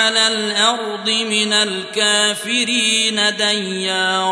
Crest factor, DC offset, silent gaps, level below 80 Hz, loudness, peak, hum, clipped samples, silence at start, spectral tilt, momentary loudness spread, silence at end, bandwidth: 16 dB; under 0.1%; none; -74 dBFS; -15 LUFS; -2 dBFS; none; under 0.1%; 0 s; -1 dB/octave; 5 LU; 0 s; 11 kHz